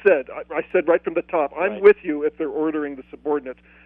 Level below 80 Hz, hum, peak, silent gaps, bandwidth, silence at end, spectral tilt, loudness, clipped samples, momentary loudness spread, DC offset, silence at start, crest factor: -58 dBFS; none; -2 dBFS; none; 4 kHz; 0.35 s; -8.5 dB/octave; -21 LUFS; under 0.1%; 12 LU; under 0.1%; 0.05 s; 20 dB